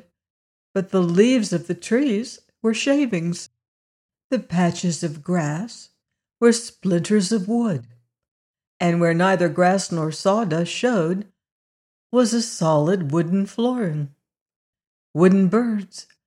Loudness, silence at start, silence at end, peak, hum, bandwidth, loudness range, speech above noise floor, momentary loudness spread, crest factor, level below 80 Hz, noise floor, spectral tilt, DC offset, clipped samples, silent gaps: -21 LUFS; 0.75 s; 0.25 s; -4 dBFS; none; 11.5 kHz; 3 LU; over 70 dB; 11 LU; 18 dB; -68 dBFS; under -90 dBFS; -6 dB/octave; under 0.1%; under 0.1%; 3.68-4.09 s, 4.24-4.30 s, 8.28-8.54 s, 8.67-8.80 s, 11.52-12.10 s, 14.41-14.46 s, 14.56-14.73 s, 14.87-15.14 s